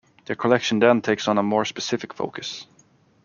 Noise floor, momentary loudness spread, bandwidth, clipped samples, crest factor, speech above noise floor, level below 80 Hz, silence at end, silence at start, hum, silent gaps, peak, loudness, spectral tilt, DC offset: -58 dBFS; 14 LU; 7.2 kHz; under 0.1%; 22 dB; 36 dB; -66 dBFS; 0.6 s; 0.3 s; none; none; -2 dBFS; -22 LUFS; -4.5 dB/octave; under 0.1%